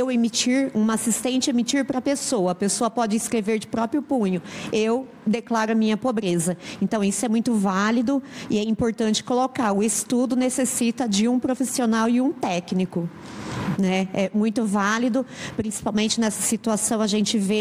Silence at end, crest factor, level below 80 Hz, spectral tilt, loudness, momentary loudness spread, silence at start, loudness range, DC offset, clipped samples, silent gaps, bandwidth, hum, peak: 0 s; 14 dB; -58 dBFS; -4 dB/octave; -23 LUFS; 6 LU; 0 s; 2 LU; under 0.1%; under 0.1%; none; 16 kHz; none; -8 dBFS